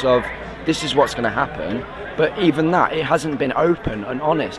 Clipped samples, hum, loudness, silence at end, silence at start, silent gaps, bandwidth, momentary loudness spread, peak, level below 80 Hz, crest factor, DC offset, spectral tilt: under 0.1%; none; -20 LUFS; 0 s; 0 s; none; 12 kHz; 9 LU; -2 dBFS; -42 dBFS; 18 dB; under 0.1%; -5.5 dB/octave